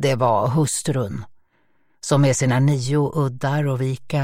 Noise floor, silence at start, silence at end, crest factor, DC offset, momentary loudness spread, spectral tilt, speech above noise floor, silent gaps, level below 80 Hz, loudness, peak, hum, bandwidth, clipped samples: -65 dBFS; 0 s; 0 s; 16 dB; under 0.1%; 7 LU; -6 dB/octave; 46 dB; none; -52 dBFS; -20 LUFS; -4 dBFS; none; 15.5 kHz; under 0.1%